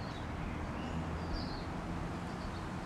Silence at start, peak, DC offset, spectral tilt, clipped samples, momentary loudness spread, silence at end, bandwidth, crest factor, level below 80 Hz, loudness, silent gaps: 0 s; -26 dBFS; under 0.1%; -6.5 dB/octave; under 0.1%; 2 LU; 0 s; 13 kHz; 12 dB; -48 dBFS; -41 LUFS; none